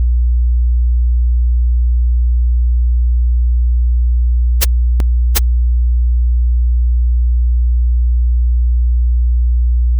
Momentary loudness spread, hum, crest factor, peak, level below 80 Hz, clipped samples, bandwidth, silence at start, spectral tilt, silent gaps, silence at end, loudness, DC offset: 1 LU; none; 12 dB; 0 dBFS; -12 dBFS; under 0.1%; 1.5 kHz; 0 s; -13 dB/octave; none; 0 s; -15 LUFS; under 0.1%